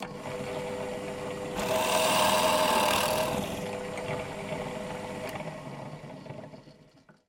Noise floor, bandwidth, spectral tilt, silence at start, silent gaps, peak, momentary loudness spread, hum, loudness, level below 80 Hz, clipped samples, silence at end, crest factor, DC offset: -58 dBFS; 17 kHz; -3 dB/octave; 0 s; none; -12 dBFS; 18 LU; none; -29 LUFS; -56 dBFS; under 0.1%; 0.55 s; 20 dB; under 0.1%